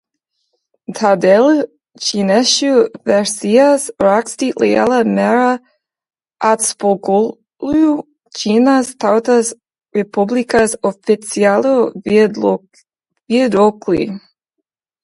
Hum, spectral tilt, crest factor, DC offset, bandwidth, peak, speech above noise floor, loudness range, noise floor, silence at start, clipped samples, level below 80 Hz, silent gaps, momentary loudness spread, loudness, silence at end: none; -4 dB/octave; 14 dB; under 0.1%; 11.5 kHz; 0 dBFS; 63 dB; 3 LU; -76 dBFS; 0.9 s; under 0.1%; -54 dBFS; none; 10 LU; -14 LUFS; 0.85 s